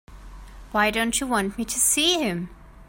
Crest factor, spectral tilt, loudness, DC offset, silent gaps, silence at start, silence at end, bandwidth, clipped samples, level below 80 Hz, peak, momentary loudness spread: 18 dB; -2 dB/octave; -22 LUFS; under 0.1%; none; 0.1 s; 0.05 s; 16.5 kHz; under 0.1%; -44 dBFS; -8 dBFS; 10 LU